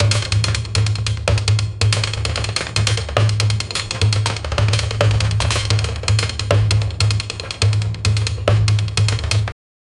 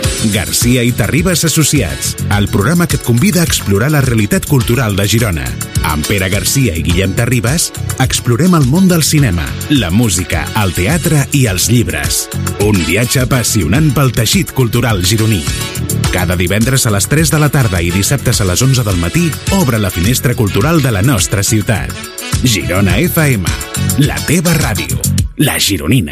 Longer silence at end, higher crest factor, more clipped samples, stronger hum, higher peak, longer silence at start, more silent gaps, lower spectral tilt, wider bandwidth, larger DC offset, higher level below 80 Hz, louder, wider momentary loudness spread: first, 0.5 s vs 0 s; first, 18 dB vs 12 dB; neither; neither; about the same, 0 dBFS vs 0 dBFS; about the same, 0 s vs 0 s; neither; about the same, -4 dB/octave vs -4.5 dB/octave; second, 11 kHz vs 16 kHz; neither; about the same, -30 dBFS vs -28 dBFS; second, -18 LUFS vs -12 LUFS; about the same, 4 LU vs 4 LU